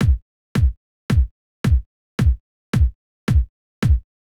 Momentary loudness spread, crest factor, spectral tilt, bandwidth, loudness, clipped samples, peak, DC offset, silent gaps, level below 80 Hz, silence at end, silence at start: 9 LU; 12 dB; -7.5 dB/octave; 12 kHz; -22 LUFS; under 0.1%; -8 dBFS; under 0.1%; 0.22-0.55 s, 0.77-1.09 s, 1.31-1.64 s, 1.86-2.18 s, 2.40-2.73 s, 2.95-3.27 s, 3.49-3.82 s; -22 dBFS; 0.35 s; 0 s